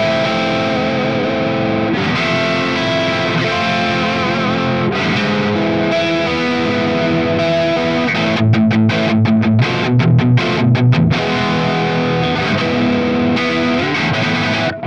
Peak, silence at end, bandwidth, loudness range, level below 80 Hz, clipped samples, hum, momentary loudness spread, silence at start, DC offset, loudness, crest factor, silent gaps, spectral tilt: -2 dBFS; 0 s; 8.4 kHz; 2 LU; -44 dBFS; under 0.1%; none; 3 LU; 0 s; 0.5%; -15 LUFS; 12 dB; none; -6.5 dB/octave